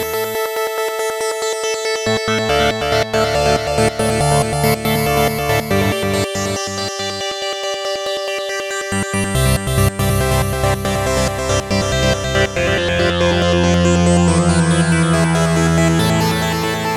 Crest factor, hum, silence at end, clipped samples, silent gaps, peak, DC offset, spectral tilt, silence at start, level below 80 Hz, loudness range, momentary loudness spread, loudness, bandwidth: 16 dB; none; 0 s; under 0.1%; none; 0 dBFS; under 0.1%; -4.5 dB/octave; 0 s; -30 dBFS; 5 LU; 7 LU; -16 LUFS; 17 kHz